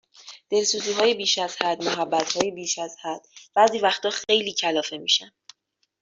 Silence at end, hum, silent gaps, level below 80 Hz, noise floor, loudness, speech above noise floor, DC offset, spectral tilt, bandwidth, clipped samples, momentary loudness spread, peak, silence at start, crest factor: 0.75 s; none; none; -72 dBFS; -71 dBFS; -23 LUFS; 47 dB; under 0.1%; -1.5 dB/octave; 7.8 kHz; under 0.1%; 11 LU; -4 dBFS; 0.25 s; 20 dB